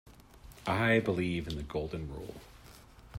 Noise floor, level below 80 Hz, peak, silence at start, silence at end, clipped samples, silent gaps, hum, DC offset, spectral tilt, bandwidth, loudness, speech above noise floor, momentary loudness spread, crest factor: -54 dBFS; -52 dBFS; -14 dBFS; 0.05 s; 0 s; under 0.1%; none; none; under 0.1%; -6.5 dB/octave; 16 kHz; -33 LUFS; 22 dB; 23 LU; 20 dB